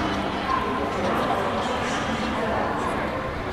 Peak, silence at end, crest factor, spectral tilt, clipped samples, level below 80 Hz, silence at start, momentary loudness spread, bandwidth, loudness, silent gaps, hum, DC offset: -12 dBFS; 0 s; 14 dB; -5 dB/octave; under 0.1%; -42 dBFS; 0 s; 2 LU; 16 kHz; -25 LUFS; none; none; 0.1%